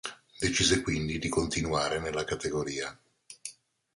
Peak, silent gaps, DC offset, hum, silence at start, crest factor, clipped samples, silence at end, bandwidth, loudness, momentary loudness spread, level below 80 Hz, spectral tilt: -12 dBFS; none; under 0.1%; none; 0.05 s; 20 dB; under 0.1%; 0.45 s; 11.5 kHz; -30 LUFS; 18 LU; -48 dBFS; -3.5 dB/octave